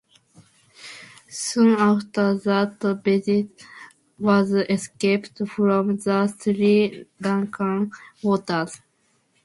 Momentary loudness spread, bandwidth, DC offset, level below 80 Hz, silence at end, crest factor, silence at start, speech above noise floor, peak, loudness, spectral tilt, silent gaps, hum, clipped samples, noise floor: 18 LU; 11.5 kHz; under 0.1%; -66 dBFS; 0.7 s; 16 dB; 0.8 s; 45 dB; -6 dBFS; -22 LUFS; -6 dB/octave; none; none; under 0.1%; -66 dBFS